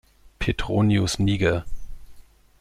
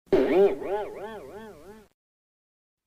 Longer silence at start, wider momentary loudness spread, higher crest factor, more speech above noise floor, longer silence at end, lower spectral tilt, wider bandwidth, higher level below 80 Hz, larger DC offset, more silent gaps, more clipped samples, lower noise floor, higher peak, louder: first, 0.25 s vs 0.1 s; second, 9 LU vs 23 LU; about the same, 18 dB vs 16 dB; about the same, 25 dB vs 23 dB; second, 0.4 s vs 1.05 s; about the same, -6 dB/octave vs -7 dB/octave; first, 13 kHz vs 8.4 kHz; first, -38 dBFS vs -52 dBFS; neither; neither; neither; about the same, -46 dBFS vs -47 dBFS; first, -6 dBFS vs -12 dBFS; about the same, -23 LUFS vs -24 LUFS